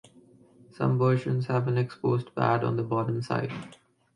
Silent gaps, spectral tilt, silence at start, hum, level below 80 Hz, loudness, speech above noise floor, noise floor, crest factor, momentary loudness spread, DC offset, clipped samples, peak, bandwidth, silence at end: none; -8.5 dB/octave; 0.8 s; none; -66 dBFS; -27 LUFS; 30 dB; -57 dBFS; 18 dB; 6 LU; under 0.1%; under 0.1%; -10 dBFS; 10 kHz; 0.4 s